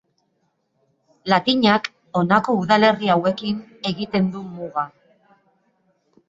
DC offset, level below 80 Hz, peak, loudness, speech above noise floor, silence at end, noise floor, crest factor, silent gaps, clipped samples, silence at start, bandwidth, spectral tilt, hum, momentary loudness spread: under 0.1%; -60 dBFS; -2 dBFS; -20 LUFS; 50 dB; 1.4 s; -69 dBFS; 20 dB; none; under 0.1%; 1.25 s; 7.8 kHz; -6.5 dB/octave; none; 12 LU